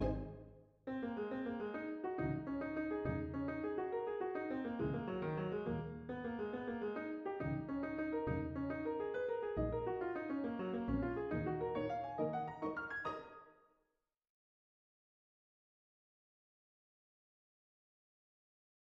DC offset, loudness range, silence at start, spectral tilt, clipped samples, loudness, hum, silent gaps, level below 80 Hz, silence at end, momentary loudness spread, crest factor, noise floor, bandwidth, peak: under 0.1%; 4 LU; 0 s; -7 dB/octave; under 0.1%; -42 LUFS; none; none; -58 dBFS; 5.35 s; 5 LU; 16 dB; -87 dBFS; 6.4 kHz; -26 dBFS